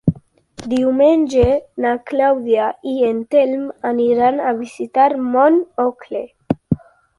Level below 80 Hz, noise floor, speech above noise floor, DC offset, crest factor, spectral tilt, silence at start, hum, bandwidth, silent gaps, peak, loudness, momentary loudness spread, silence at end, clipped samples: -40 dBFS; -40 dBFS; 24 dB; under 0.1%; 14 dB; -7.5 dB/octave; 0.05 s; none; 11.5 kHz; none; -2 dBFS; -17 LUFS; 11 LU; 0.4 s; under 0.1%